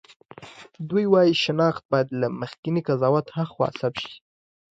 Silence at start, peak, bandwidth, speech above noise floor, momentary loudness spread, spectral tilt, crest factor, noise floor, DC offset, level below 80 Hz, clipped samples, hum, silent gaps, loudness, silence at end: 0.4 s; -6 dBFS; 8 kHz; 22 dB; 19 LU; -6.5 dB/octave; 18 dB; -45 dBFS; under 0.1%; -64 dBFS; under 0.1%; none; 1.85-1.89 s, 2.58-2.63 s; -23 LUFS; 0.55 s